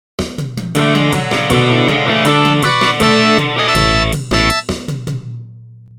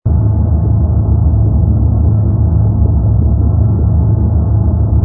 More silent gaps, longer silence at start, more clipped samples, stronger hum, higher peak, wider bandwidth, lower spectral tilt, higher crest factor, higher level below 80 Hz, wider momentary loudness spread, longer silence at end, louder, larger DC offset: neither; first, 0.2 s vs 0.05 s; neither; neither; about the same, 0 dBFS vs 0 dBFS; first, 17.5 kHz vs 1.6 kHz; second, -4.5 dB/octave vs -15.5 dB/octave; about the same, 14 dB vs 10 dB; second, -30 dBFS vs -14 dBFS; first, 12 LU vs 1 LU; first, 0.2 s vs 0 s; about the same, -13 LUFS vs -12 LUFS; neither